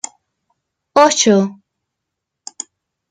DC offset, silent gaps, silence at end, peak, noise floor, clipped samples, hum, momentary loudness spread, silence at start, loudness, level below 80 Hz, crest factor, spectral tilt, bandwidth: under 0.1%; none; 1.55 s; 0 dBFS; -79 dBFS; under 0.1%; none; 23 LU; 0.95 s; -13 LUFS; -64 dBFS; 18 dB; -3.5 dB/octave; 10.5 kHz